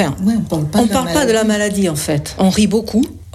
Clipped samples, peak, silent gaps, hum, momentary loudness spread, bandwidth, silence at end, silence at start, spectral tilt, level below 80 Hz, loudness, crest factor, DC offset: under 0.1%; -2 dBFS; none; none; 4 LU; 15 kHz; 0.05 s; 0 s; -5 dB/octave; -38 dBFS; -15 LUFS; 14 dB; under 0.1%